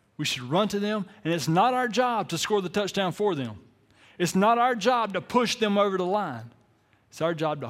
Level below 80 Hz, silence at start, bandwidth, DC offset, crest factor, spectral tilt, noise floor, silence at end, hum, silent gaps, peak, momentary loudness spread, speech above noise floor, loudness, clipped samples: -66 dBFS; 0.2 s; 16.5 kHz; under 0.1%; 18 dB; -4.5 dB/octave; -64 dBFS; 0 s; none; none; -8 dBFS; 8 LU; 38 dB; -25 LUFS; under 0.1%